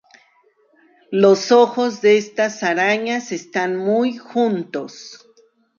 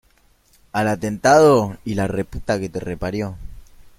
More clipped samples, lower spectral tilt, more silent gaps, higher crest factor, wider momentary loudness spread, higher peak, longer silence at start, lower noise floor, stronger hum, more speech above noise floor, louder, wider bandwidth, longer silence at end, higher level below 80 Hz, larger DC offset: neither; about the same, -4.5 dB/octave vs -5.5 dB/octave; neither; about the same, 16 dB vs 20 dB; about the same, 14 LU vs 15 LU; about the same, -2 dBFS vs 0 dBFS; first, 1.1 s vs 0.75 s; about the same, -58 dBFS vs -57 dBFS; neither; about the same, 41 dB vs 39 dB; about the same, -18 LUFS vs -19 LUFS; second, 7.4 kHz vs 15.5 kHz; first, 0.6 s vs 0.35 s; second, -72 dBFS vs -42 dBFS; neither